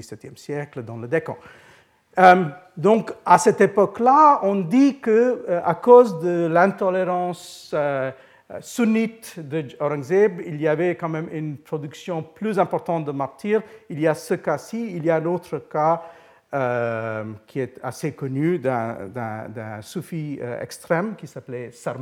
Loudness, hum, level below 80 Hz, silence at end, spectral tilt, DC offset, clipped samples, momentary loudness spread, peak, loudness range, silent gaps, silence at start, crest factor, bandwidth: -21 LUFS; none; -68 dBFS; 0 s; -6.5 dB/octave; under 0.1%; under 0.1%; 17 LU; 0 dBFS; 10 LU; none; 0 s; 22 dB; 15.5 kHz